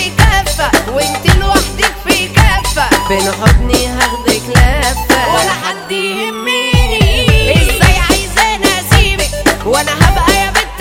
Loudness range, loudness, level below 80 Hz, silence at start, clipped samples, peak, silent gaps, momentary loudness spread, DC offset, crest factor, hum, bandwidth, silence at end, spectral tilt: 2 LU; -11 LUFS; -16 dBFS; 0 s; 0.8%; 0 dBFS; none; 5 LU; under 0.1%; 10 dB; none; 17 kHz; 0 s; -4 dB/octave